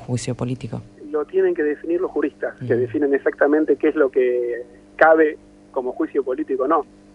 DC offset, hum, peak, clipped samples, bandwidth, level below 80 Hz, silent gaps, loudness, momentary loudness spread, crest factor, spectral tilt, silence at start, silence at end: under 0.1%; 50 Hz at -55 dBFS; 0 dBFS; under 0.1%; 11 kHz; -56 dBFS; none; -20 LUFS; 12 LU; 20 dB; -7 dB/octave; 0 s; 0.3 s